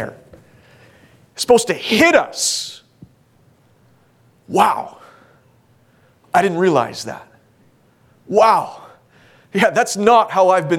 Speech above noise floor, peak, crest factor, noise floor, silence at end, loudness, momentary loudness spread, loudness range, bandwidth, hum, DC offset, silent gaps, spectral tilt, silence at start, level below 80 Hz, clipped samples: 39 dB; 0 dBFS; 18 dB; -54 dBFS; 0 s; -15 LUFS; 18 LU; 6 LU; 17.5 kHz; none; under 0.1%; none; -3.5 dB/octave; 0 s; -60 dBFS; under 0.1%